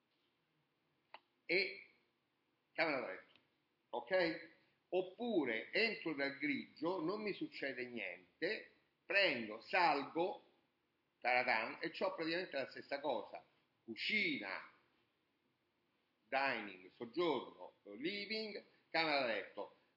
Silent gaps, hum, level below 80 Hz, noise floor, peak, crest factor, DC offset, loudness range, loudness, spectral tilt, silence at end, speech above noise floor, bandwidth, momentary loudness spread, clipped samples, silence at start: none; none; under -90 dBFS; -84 dBFS; -20 dBFS; 22 dB; under 0.1%; 5 LU; -40 LUFS; -5.5 dB/octave; 0.25 s; 43 dB; 5.8 kHz; 15 LU; under 0.1%; 1.5 s